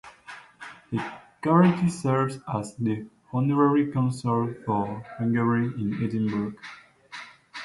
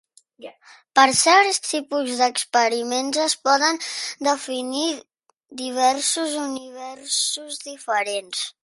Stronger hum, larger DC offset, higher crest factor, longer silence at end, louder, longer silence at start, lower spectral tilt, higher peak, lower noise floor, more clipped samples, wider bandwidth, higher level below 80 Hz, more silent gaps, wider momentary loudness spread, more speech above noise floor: neither; neither; about the same, 20 dB vs 20 dB; second, 0 s vs 0.15 s; second, -26 LUFS vs -21 LUFS; second, 0.05 s vs 0.4 s; first, -7.5 dB/octave vs -0.5 dB/octave; second, -6 dBFS vs -2 dBFS; about the same, -47 dBFS vs -46 dBFS; neither; about the same, 11.5 kHz vs 12 kHz; first, -62 dBFS vs -72 dBFS; neither; first, 21 LU vs 15 LU; about the same, 22 dB vs 25 dB